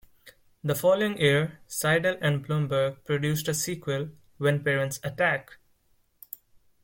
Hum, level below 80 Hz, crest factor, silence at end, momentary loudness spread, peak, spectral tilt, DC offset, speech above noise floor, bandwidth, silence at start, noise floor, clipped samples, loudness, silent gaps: none; -62 dBFS; 18 dB; 1.3 s; 11 LU; -10 dBFS; -4.5 dB/octave; under 0.1%; 41 dB; 17 kHz; 0.25 s; -67 dBFS; under 0.1%; -26 LUFS; none